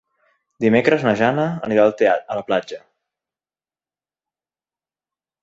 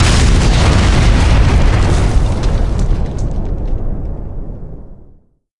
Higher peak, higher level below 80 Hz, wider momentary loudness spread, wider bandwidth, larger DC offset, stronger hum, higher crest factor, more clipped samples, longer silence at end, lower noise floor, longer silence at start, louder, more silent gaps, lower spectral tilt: about the same, -2 dBFS vs 0 dBFS; second, -60 dBFS vs -14 dBFS; second, 8 LU vs 16 LU; second, 7.8 kHz vs 11.5 kHz; second, under 0.1% vs 4%; neither; first, 20 dB vs 12 dB; neither; first, 2.65 s vs 0.05 s; first, under -90 dBFS vs -45 dBFS; first, 0.6 s vs 0 s; second, -18 LUFS vs -14 LUFS; neither; first, -7 dB/octave vs -5.5 dB/octave